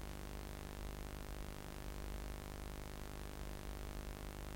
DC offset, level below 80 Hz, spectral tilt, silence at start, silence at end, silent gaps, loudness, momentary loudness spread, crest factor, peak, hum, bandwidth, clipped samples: under 0.1%; -50 dBFS; -5 dB/octave; 0 s; 0 s; none; -50 LUFS; 1 LU; 18 dB; -30 dBFS; none; 16.5 kHz; under 0.1%